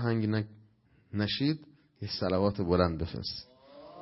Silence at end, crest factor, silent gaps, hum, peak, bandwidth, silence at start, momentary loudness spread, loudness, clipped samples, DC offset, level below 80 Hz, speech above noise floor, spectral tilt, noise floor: 0 s; 22 dB; none; none; -10 dBFS; 6 kHz; 0 s; 15 LU; -31 LUFS; under 0.1%; under 0.1%; -52 dBFS; 34 dB; -9.5 dB/octave; -64 dBFS